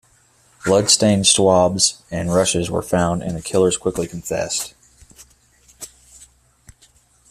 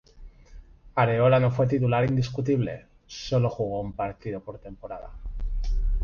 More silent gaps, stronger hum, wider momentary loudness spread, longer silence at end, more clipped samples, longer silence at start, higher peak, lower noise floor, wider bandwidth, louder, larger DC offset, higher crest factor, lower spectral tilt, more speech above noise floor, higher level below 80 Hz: neither; neither; second, 15 LU vs 19 LU; first, 1.45 s vs 0 s; neither; first, 0.65 s vs 0.15 s; first, 0 dBFS vs -8 dBFS; first, -56 dBFS vs -48 dBFS; first, 15 kHz vs 7 kHz; first, -17 LUFS vs -26 LUFS; neither; about the same, 20 dB vs 18 dB; second, -3.5 dB/octave vs -7.5 dB/octave; first, 38 dB vs 23 dB; second, -48 dBFS vs -34 dBFS